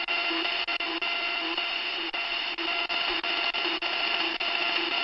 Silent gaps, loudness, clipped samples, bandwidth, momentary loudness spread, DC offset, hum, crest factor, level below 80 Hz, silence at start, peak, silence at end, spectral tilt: none; -27 LUFS; under 0.1%; 7.4 kHz; 3 LU; under 0.1%; none; 14 dB; -62 dBFS; 0 s; -14 dBFS; 0 s; -2 dB/octave